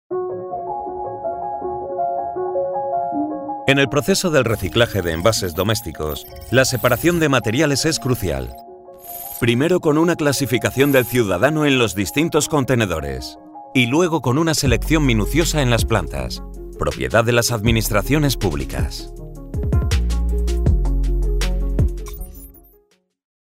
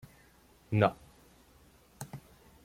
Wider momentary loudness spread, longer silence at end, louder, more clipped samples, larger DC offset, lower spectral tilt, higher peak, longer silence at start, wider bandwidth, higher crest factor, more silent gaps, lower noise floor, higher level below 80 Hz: second, 12 LU vs 22 LU; first, 0.9 s vs 0.45 s; first, -19 LUFS vs -30 LUFS; neither; neither; second, -5 dB/octave vs -7 dB/octave; first, -2 dBFS vs -10 dBFS; second, 0.1 s vs 0.7 s; about the same, 16.5 kHz vs 16.5 kHz; second, 16 dB vs 26 dB; neither; about the same, -59 dBFS vs -62 dBFS; first, -28 dBFS vs -64 dBFS